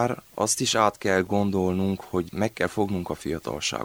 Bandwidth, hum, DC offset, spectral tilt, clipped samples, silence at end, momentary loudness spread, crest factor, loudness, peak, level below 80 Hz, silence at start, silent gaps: over 20 kHz; none; under 0.1%; -4 dB/octave; under 0.1%; 0 s; 8 LU; 20 dB; -25 LUFS; -6 dBFS; -54 dBFS; 0 s; none